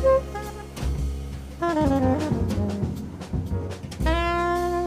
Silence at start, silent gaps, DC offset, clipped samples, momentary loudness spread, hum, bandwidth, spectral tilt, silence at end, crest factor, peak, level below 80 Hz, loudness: 0 s; none; under 0.1%; under 0.1%; 12 LU; none; 15.5 kHz; -7 dB/octave; 0 s; 14 dB; -10 dBFS; -32 dBFS; -26 LUFS